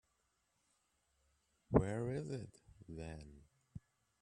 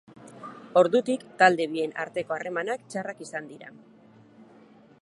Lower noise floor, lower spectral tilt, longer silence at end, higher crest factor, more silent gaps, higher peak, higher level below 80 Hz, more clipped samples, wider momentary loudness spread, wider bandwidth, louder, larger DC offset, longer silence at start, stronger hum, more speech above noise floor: first, -82 dBFS vs -54 dBFS; first, -8 dB/octave vs -4.5 dB/octave; second, 0.45 s vs 1.35 s; first, 30 dB vs 24 dB; neither; second, -16 dBFS vs -4 dBFS; first, -58 dBFS vs -80 dBFS; neither; about the same, 23 LU vs 23 LU; about the same, 11 kHz vs 11.5 kHz; second, -40 LUFS vs -26 LUFS; neither; first, 1.7 s vs 0.25 s; neither; first, 38 dB vs 28 dB